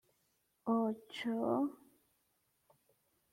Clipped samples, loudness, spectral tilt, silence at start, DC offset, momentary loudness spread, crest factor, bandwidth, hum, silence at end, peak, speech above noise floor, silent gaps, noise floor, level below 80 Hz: under 0.1%; -37 LUFS; -6.5 dB/octave; 0.65 s; under 0.1%; 7 LU; 18 dB; 15.5 kHz; none; 1.6 s; -22 dBFS; 43 dB; none; -79 dBFS; -84 dBFS